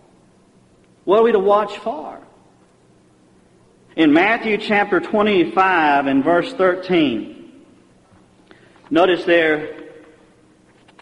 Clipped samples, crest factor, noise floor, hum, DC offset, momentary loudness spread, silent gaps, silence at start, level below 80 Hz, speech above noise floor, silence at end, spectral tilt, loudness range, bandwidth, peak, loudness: under 0.1%; 16 dB; -53 dBFS; none; under 0.1%; 16 LU; none; 1.05 s; -58 dBFS; 37 dB; 1.1 s; -6.5 dB/octave; 5 LU; 10.5 kHz; -2 dBFS; -16 LUFS